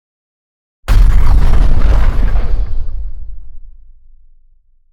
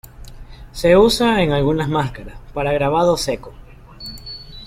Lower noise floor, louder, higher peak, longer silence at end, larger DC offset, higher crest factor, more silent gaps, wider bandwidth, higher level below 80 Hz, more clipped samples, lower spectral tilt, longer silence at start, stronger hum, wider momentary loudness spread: first, -47 dBFS vs -37 dBFS; about the same, -16 LUFS vs -17 LUFS; about the same, 0 dBFS vs -2 dBFS; first, 1.25 s vs 0 s; neither; second, 10 dB vs 16 dB; neither; second, 5.8 kHz vs 16.5 kHz; first, -12 dBFS vs -36 dBFS; neither; first, -7 dB/octave vs -5.5 dB/octave; first, 0.85 s vs 0.05 s; neither; second, 18 LU vs 21 LU